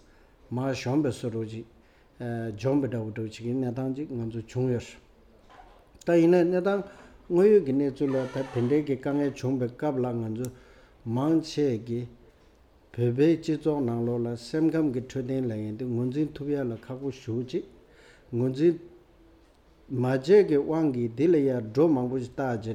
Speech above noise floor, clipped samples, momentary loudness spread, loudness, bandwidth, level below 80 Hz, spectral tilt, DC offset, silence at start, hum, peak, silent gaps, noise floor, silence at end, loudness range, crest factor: 32 dB; under 0.1%; 13 LU; -27 LUFS; 11.5 kHz; -60 dBFS; -8 dB/octave; under 0.1%; 0.5 s; none; -10 dBFS; none; -58 dBFS; 0 s; 7 LU; 18 dB